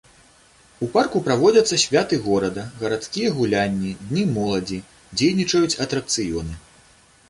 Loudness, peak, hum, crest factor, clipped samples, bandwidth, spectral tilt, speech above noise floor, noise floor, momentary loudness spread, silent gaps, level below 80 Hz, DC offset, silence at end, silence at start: -21 LUFS; -4 dBFS; none; 18 dB; under 0.1%; 11.5 kHz; -4.5 dB/octave; 33 dB; -53 dBFS; 12 LU; none; -48 dBFS; under 0.1%; 0.7 s; 0.8 s